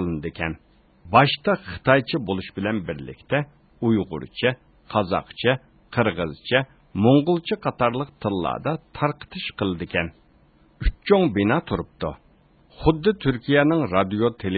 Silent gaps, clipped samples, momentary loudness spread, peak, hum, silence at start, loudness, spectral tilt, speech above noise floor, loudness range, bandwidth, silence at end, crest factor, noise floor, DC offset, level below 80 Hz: none; under 0.1%; 12 LU; -2 dBFS; none; 0 s; -23 LUFS; -11 dB/octave; 34 dB; 3 LU; 4.8 kHz; 0 s; 20 dB; -56 dBFS; under 0.1%; -40 dBFS